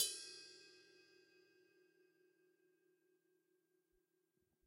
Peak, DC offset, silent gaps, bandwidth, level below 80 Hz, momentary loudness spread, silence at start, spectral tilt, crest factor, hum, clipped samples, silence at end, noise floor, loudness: -24 dBFS; under 0.1%; none; 14 kHz; under -90 dBFS; 23 LU; 0 s; 2 dB/octave; 30 dB; none; under 0.1%; 3.7 s; -85 dBFS; -47 LUFS